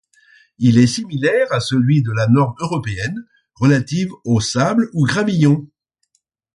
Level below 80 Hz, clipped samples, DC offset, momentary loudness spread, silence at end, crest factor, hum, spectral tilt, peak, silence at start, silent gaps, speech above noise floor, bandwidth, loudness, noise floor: -50 dBFS; under 0.1%; under 0.1%; 8 LU; 0.9 s; 16 dB; none; -6 dB/octave; -2 dBFS; 0.6 s; none; 51 dB; 11.5 kHz; -17 LUFS; -67 dBFS